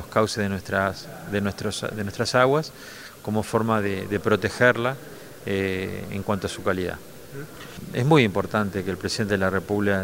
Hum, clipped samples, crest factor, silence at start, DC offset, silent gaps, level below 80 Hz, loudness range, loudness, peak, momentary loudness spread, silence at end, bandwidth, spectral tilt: none; under 0.1%; 22 dB; 0 s; 0.2%; none; -52 dBFS; 3 LU; -24 LUFS; -2 dBFS; 18 LU; 0 s; 16 kHz; -5.5 dB/octave